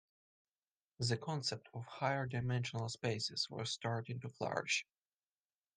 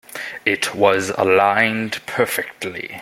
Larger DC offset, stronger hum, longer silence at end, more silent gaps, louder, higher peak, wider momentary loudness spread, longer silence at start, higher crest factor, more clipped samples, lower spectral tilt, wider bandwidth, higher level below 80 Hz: neither; neither; first, 0.95 s vs 0 s; neither; second, -40 LUFS vs -18 LUFS; second, -22 dBFS vs -2 dBFS; second, 6 LU vs 13 LU; first, 1 s vs 0.1 s; about the same, 20 dB vs 18 dB; neither; about the same, -4 dB/octave vs -3.5 dB/octave; second, 10 kHz vs 16.5 kHz; second, -76 dBFS vs -62 dBFS